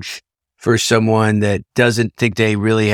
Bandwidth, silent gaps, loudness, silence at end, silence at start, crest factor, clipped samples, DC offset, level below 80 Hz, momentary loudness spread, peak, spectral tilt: 16 kHz; none; -16 LUFS; 0 s; 0 s; 14 dB; under 0.1%; under 0.1%; -50 dBFS; 8 LU; -2 dBFS; -5 dB/octave